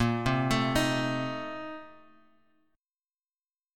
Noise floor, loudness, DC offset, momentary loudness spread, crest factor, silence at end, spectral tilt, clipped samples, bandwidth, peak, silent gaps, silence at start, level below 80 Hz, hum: under -90 dBFS; -29 LUFS; under 0.1%; 14 LU; 18 dB; 1.85 s; -5.5 dB/octave; under 0.1%; 17.5 kHz; -14 dBFS; none; 0 s; -50 dBFS; none